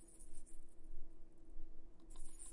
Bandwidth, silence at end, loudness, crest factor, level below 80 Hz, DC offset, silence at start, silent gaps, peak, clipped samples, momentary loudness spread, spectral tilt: 11.5 kHz; 0 s; -62 LUFS; 12 dB; -52 dBFS; under 0.1%; 0 s; none; -32 dBFS; under 0.1%; 5 LU; -4.5 dB/octave